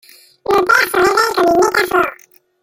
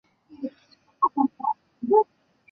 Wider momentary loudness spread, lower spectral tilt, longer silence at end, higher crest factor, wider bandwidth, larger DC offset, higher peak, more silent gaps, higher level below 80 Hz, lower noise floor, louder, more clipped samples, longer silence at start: second, 6 LU vs 16 LU; second, -3 dB/octave vs -9.5 dB/octave; about the same, 0.5 s vs 0.5 s; second, 14 dB vs 20 dB; first, 17 kHz vs 5.2 kHz; neither; first, -2 dBFS vs -6 dBFS; neither; first, -48 dBFS vs -74 dBFS; second, -44 dBFS vs -60 dBFS; first, -13 LUFS vs -25 LUFS; neither; about the same, 0.5 s vs 0.4 s